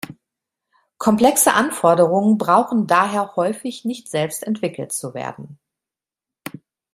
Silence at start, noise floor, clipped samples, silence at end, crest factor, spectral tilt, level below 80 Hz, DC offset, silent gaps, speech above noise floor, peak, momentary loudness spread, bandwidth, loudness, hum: 0.1 s; -89 dBFS; under 0.1%; 1.4 s; 18 dB; -4.5 dB/octave; -62 dBFS; under 0.1%; none; 71 dB; -2 dBFS; 21 LU; 16 kHz; -18 LUFS; none